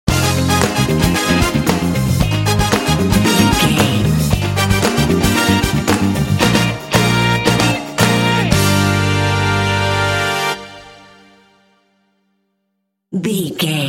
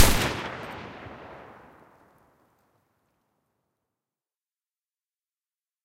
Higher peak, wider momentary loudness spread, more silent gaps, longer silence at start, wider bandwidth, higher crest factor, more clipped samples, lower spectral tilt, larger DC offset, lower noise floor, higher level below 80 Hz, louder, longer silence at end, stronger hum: about the same, 0 dBFS vs -2 dBFS; second, 4 LU vs 23 LU; neither; about the same, 0.05 s vs 0 s; about the same, 17 kHz vs 16 kHz; second, 16 dB vs 28 dB; neither; first, -4.5 dB/octave vs -3 dB/octave; neither; second, -71 dBFS vs under -90 dBFS; first, -30 dBFS vs -40 dBFS; first, -14 LUFS vs -29 LUFS; second, 0 s vs 4.5 s; neither